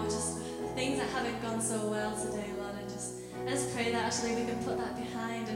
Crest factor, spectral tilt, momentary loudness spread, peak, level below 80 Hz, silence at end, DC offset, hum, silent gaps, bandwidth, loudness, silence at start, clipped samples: 14 dB; -4 dB/octave; 7 LU; -20 dBFS; -58 dBFS; 0 s; under 0.1%; none; none; 16 kHz; -34 LUFS; 0 s; under 0.1%